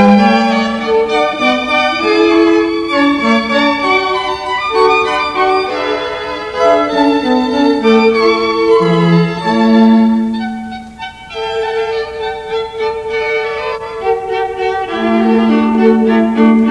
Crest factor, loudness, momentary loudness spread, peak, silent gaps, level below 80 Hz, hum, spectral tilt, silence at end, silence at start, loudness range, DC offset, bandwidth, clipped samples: 12 dB; -12 LUFS; 10 LU; 0 dBFS; none; -44 dBFS; none; -6 dB/octave; 0 s; 0 s; 7 LU; under 0.1%; 10.5 kHz; under 0.1%